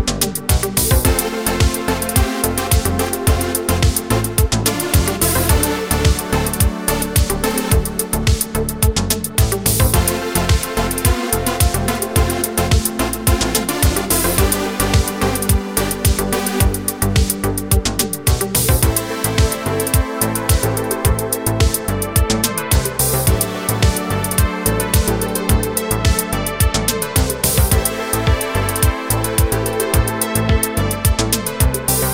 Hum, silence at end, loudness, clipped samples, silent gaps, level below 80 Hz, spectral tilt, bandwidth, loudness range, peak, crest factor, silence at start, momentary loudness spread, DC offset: none; 0 s; -17 LUFS; under 0.1%; none; -22 dBFS; -4 dB/octave; over 20 kHz; 1 LU; -2 dBFS; 14 dB; 0 s; 3 LU; 0.2%